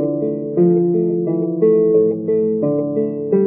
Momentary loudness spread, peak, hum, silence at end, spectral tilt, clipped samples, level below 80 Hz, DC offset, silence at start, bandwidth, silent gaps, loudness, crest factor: 6 LU; -4 dBFS; none; 0 s; -15.5 dB/octave; under 0.1%; -66 dBFS; under 0.1%; 0 s; 2.7 kHz; none; -17 LUFS; 12 dB